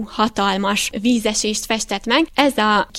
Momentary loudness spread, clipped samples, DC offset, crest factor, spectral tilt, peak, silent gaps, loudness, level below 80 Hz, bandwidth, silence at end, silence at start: 5 LU; under 0.1%; under 0.1%; 18 dB; -3 dB/octave; 0 dBFS; none; -18 LUFS; -44 dBFS; 16.5 kHz; 0 s; 0 s